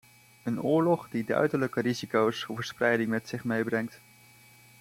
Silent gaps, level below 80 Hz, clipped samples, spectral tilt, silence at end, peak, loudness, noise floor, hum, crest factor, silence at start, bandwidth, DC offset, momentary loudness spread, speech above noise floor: none; -70 dBFS; under 0.1%; -6 dB/octave; 0.85 s; -12 dBFS; -29 LUFS; -56 dBFS; none; 18 dB; 0.45 s; 16.5 kHz; under 0.1%; 9 LU; 28 dB